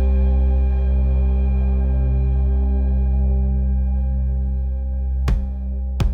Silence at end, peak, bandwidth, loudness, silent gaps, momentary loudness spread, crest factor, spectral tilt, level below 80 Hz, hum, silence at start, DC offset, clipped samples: 0 s; -8 dBFS; 3.7 kHz; -21 LUFS; none; 6 LU; 8 dB; -9.5 dB/octave; -18 dBFS; none; 0 s; under 0.1%; under 0.1%